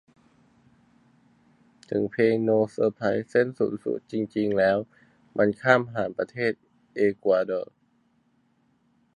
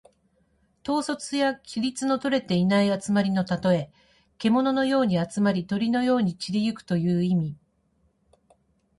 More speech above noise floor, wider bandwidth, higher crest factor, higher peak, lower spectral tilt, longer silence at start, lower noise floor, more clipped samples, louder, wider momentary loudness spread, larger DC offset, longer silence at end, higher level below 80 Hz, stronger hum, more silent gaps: about the same, 42 dB vs 44 dB; second, 10 kHz vs 11.5 kHz; first, 22 dB vs 14 dB; first, -4 dBFS vs -12 dBFS; first, -7.5 dB/octave vs -6 dB/octave; first, 1.9 s vs 0.85 s; about the same, -67 dBFS vs -68 dBFS; neither; about the same, -25 LUFS vs -25 LUFS; first, 10 LU vs 6 LU; neither; about the same, 1.55 s vs 1.45 s; second, -66 dBFS vs -60 dBFS; neither; neither